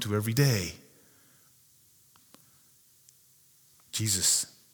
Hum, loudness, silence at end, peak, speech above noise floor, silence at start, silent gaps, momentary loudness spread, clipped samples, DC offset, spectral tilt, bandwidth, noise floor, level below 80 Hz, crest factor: none; -27 LUFS; 0.25 s; -10 dBFS; 34 dB; 0 s; none; 14 LU; under 0.1%; under 0.1%; -3.5 dB/octave; over 20 kHz; -62 dBFS; -64 dBFS; 22 dB